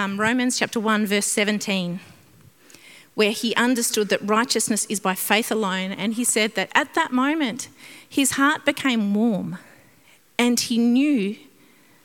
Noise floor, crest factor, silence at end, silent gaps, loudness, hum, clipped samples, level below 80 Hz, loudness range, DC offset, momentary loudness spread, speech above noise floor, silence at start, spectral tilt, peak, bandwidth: -56 dBFS; 20 dB; 0.65 s; none; -21 LUFS; none; under 0.1%; -72 dBFS; 2 LU; under 0.1%; 9 LU; 34 dB; 0 s; -3 dB/octave; -2 dBFS; 18 kHz